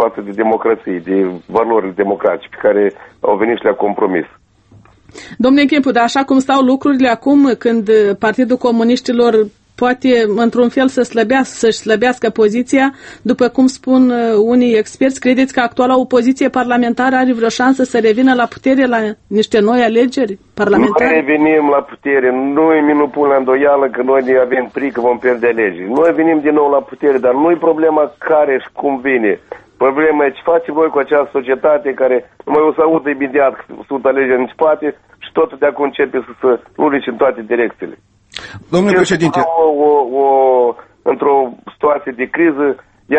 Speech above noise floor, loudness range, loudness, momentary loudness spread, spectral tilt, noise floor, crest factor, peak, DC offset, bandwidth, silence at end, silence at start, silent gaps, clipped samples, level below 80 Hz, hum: 33 dB; 3 LU; -13 LUFS; 6 LU; -5.5 dB/octave; -45 dBFS; 12 dB; 0 dBFS; under 0.1%; 8.6 kHz; 0 s; 0 s; none; under 0.1%; -52 dBFS; none